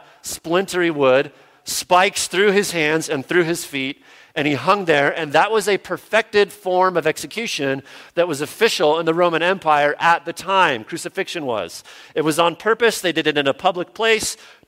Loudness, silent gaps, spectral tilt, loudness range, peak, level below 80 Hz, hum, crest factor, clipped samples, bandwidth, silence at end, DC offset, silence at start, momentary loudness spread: -19 LUFS; none; -3.5 dB/octave; 2 LU; -2 dBFS; -60 dBFS; none; 18 dB; under 0.1%; 16 kHz; 0.3 s; under 0.1%; 0.25 s; 9 LU